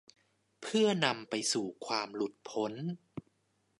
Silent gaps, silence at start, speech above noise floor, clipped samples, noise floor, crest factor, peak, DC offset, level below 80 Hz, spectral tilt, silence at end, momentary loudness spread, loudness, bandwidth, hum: none; 0.6 s; 43 dB; under 0.1%; -76 dBFS; 24 dB; -12 dBFS; under 0.1%; -80 dBFS; -3.5 dB/octave; 0.6 s; 17 LU; -33 LUFS; 11.5 kHz; none